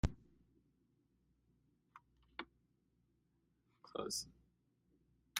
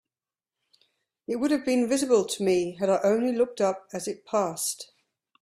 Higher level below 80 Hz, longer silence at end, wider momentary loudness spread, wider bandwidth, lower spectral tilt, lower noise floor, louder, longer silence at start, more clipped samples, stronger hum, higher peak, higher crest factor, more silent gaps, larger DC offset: first, -58 dBFS vs -70 dBFS; second, 0 s vs 0.55 s; first, 23 LU vs 11 LU; second, 10.5 kHz vs 15.5 kHz; about the same, -3.5 dB/octave vs -4 dB/octave; second, -80 dBFS vs under -90 dBFS; second, -47 LUFS vs -26 LUFS; second, 0.05 s vs 1.3 s; neither; neither; second, -22 dBFS vs -10 dBFS; first, 30 dB vs 18 dB; neither; neither